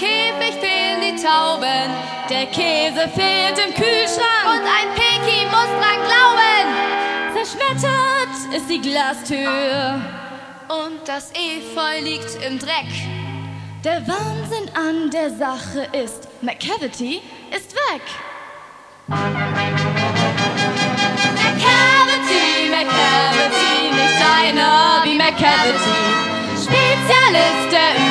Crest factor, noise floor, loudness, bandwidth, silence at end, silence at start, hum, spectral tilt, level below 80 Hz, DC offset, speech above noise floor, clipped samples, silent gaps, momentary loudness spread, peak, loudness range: 16 dB; -41 dBFS; -16 LUFS; 11 kHz; 0 s; 0 s; none; -3.5 dB/octave; -56 dBFS; under 0.1%; 23 dB; under 0.1%; none; 14 LU; 0 dBFS; 10 LU